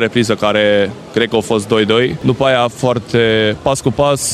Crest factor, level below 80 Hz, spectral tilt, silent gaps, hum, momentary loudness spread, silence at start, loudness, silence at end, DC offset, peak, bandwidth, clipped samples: 14 dB; -42 dBFS; -4.5 dB/octave; none; none; 4 LU; 0 s; -14 LUFS; 0 s; under 0.1%; 0 dBFS; 14.5 kHz; under 0.1%